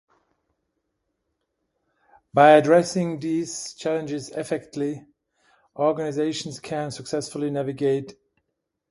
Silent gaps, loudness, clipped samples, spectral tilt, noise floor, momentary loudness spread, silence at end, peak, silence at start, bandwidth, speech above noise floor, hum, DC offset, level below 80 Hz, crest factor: none; -23 LUFS; under 0.1%; -5 dB/octave; -79 dBFS; 15 LU; 0.8 s; -2 dBFS; 2.35 s; 11.5 kHz; 57 dB; none; under 0.1%; -66 dBFS; 24 dB